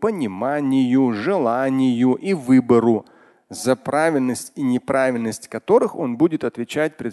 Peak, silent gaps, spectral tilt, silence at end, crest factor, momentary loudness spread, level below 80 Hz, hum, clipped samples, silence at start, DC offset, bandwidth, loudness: -2 dBFS; none; -6 dB/octave; 0 s; 16 dB; 8 LU; -62 dBFS; none; under 0.1%; 0 s; under 0.1%; 12.5 kHz; -20 LUFS